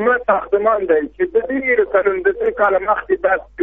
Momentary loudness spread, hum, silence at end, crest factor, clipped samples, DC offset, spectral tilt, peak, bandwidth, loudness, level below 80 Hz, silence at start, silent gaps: 3 LU; none; 0 s; 14 dB; under 0.1%; 0.1%; -3.5 dB/octave; -2 dBFS; 3.8 kHz; -17 LUFS; -46 dBFS; 0 s; none